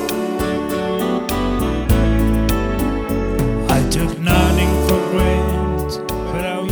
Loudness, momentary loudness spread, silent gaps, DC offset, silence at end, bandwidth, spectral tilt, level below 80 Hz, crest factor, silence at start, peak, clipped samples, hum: -18 LUFS; 6 LU; none; under 0.1%; 0 s; over 20 kHz; -6 dB/octave; -22 dBFS; 14 dB; 0 s; -4 dBFS; under 0.1%; none